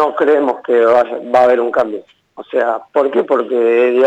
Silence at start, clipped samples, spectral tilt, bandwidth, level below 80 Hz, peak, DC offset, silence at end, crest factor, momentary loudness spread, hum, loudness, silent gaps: 0 s; under 0.1%; -6 dB/octave; 8 kHz; -62 dBFS; -2 dBFS; under 0.1%; 0 s; 10 dB; 6 LU; none; -14 LUFS; none